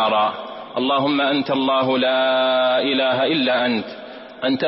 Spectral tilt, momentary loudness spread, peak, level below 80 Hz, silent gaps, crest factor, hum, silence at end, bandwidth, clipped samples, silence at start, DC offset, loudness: -9 dB/octave; 11 LU; -8 dBFS; -66 dBFS; none; 12 dB; none; 0 s; 5.8 kHz; under 0.1%; 0 s; under 0.1%; -19 LUFS